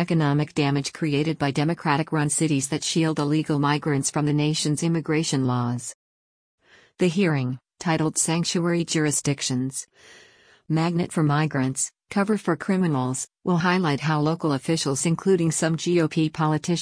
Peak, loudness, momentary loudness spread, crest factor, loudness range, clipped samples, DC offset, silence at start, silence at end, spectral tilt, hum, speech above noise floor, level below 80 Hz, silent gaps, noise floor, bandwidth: -8 dBFS; -23 LUFS; 4 LU; 16 dB; 3 LU; under 0.1%; under 0.1%; 0 s; 0 s; -5 dB/octave; none; over 67 dB; -60 dBFS; 5.94-6.58 s; under -90 dBFS; 10.5 kHz